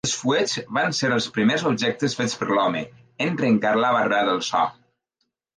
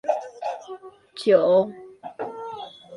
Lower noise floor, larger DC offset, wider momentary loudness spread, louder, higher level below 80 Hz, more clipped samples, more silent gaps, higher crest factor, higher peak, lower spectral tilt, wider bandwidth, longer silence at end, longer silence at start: first, -76 dBFS vs -41 dBFS; neither; second, 6 LU vs 23 LU; about the same, -22 LUFS vs -23 LUFS; first, -64 dBFS vs -72 dBFS; neither; neither; second, 14 dB vs 20 dB; about the same, -8 dBFS vs -6 dBFS; second, -4 dB/octave vs -6 dB/octave; about the same, 10 kHz vs 11 kHz; first, 0.85 s vs 0 s; about the same, 0.05 s vs 0.05 s